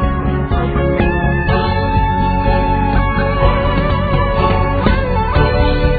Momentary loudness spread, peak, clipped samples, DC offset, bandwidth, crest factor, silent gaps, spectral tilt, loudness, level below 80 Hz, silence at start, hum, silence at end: 2 LU; 0 dBFS; under 0.1%; under 0.1%; 4.9 kHz; 14 dB; none; -10 dB/octave; -15 LUFS; -18 dBFS; 0 s; none; 0 s